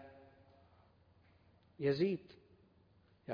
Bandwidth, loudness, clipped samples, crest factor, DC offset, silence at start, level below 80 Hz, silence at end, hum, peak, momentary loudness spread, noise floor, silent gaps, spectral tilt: 5.2 kHz; -37 LUFS; under 0.1%; 20 dB; under 0.1%; 0 s; -76 dBFS; 0 s; none; -22 dBFS; 27 LU; -69 dBFS; none; -6.5 dB/octave